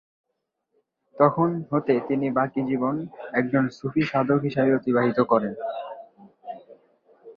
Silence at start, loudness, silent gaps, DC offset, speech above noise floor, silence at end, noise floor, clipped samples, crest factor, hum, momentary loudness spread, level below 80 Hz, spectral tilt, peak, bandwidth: 1.15 s; -24 LUFS; none; under 0.1%; 56 dB; 0.05 s; -79 dBFS; under 0.1%; 20 dB; none; 19 LU; -64 dBFS; -9 dB/octave; -4 dBFS; 7 kHz